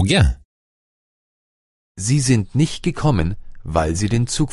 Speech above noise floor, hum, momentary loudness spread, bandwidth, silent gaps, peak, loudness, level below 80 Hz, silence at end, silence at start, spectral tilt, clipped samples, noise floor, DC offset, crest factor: over 72 dB; none; 9 LU; 11.5 kHz; 0.45-1.95 s; 0 dBFS; -19 LUFS; -30 dBFS; 0 s; 0 s; -5.5 dB/octave; under 0.1%; under -90 dBFS; under 0.1%; 18 dB